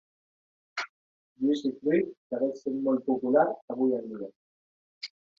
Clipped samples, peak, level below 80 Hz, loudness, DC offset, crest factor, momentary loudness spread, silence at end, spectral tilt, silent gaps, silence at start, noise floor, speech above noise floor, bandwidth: under 0.1%; -10 dBFS; -78 dBFS; -29 LUFS; under 0.1%; 20 dB; 16 LU; 0.3 s; -6.5 dB/octave; 0.89-1.36 s, 2.17-2.30 s, 3.62-3.68 s, 4.36-5.01 s; 0.75 s; under -90 dBFS; over 62 dB; 7.4 kHz